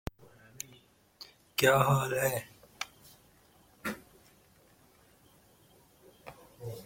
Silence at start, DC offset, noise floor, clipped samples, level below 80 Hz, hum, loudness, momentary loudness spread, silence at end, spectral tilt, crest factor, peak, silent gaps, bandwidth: 1.2 s; under 0.1%; -63 dBFS; under 0.1%; -60 dBFS; none; -31 LUFS; 26 LU; 0 s; -4.5 dB/octave; 26 dB; -10 dBFS; none; 16.5 kHz